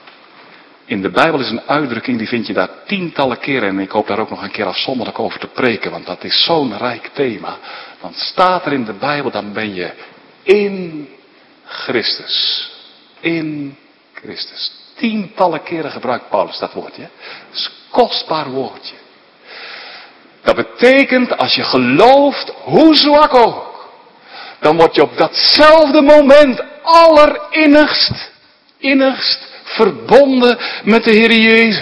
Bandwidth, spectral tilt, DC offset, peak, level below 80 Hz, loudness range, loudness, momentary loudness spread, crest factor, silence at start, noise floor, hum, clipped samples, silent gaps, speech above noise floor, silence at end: 11 kHz; -5.5 dB/octave; under 0.1%; 0 dBFS; -46 dBFS; 11 LU; -12 LUFS; 20 LU; 14 dB; 0.9 s; -48 dBFS; none; 0.7%; none; 36 dB; 0 s